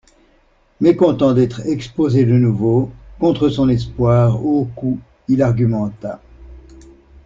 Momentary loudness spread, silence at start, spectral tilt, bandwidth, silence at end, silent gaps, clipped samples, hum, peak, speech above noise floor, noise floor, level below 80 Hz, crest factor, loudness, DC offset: 10 LU; 0.8 s; -9 dB/octave; 7.4 kHz; 0.65 s; none; under 0.1%; none; -2 dBFS; 40 dB; -55 dBFS; -42 dBFS; 14 dB; -16 LUFS; under 0.1%